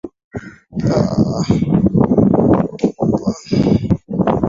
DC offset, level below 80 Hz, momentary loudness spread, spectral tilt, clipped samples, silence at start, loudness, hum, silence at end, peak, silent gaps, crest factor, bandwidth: under 0.1%; -36 dBFS; 16 LU; -8.5 dB/octave; under 0.1%; 0.05 s; -16 LUFS; none; 0 s; 0 dBFS; 0.24-0.31 s; 14 dB; 7.6 kHz